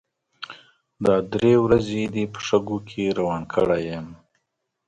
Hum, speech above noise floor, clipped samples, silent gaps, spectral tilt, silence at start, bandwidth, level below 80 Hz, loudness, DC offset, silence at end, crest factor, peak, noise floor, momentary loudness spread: none; 56 dB; under 0.1%; none; -6.5 dB/octave; 0.4 s; 9.2 kHz; -50 dBFS; -22 LUFS; under 0.1%; 0.75 s; 20 dB; -4 dBFS; -77 dBFS; 20 LU